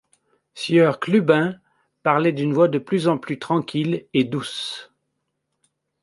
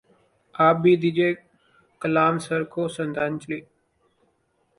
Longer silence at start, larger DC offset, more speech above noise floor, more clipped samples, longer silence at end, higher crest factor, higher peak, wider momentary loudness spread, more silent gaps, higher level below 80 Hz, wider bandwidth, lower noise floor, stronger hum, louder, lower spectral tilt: about the same, 0.55 s vs 0.6 s; neither; first, 56 dB vs 46 dB; neither; about the same, 1.2 s vs 1.15 s; about the same, 20 dB vs 20 dB; first, -2 dBFS vs -6 dBFS; second, 11 LU vs 16 LU; neither; about the same, -68 dBFS vs -66 dBFS; about the same, 11.5 kHz vs 11.5 kHz; first, -76 dBFS vs -68 dBFS; neither; about the same, -21 LUFS vs -23 LUFS; about the same, -6.5 dB/octave vs -6.5 dB/octave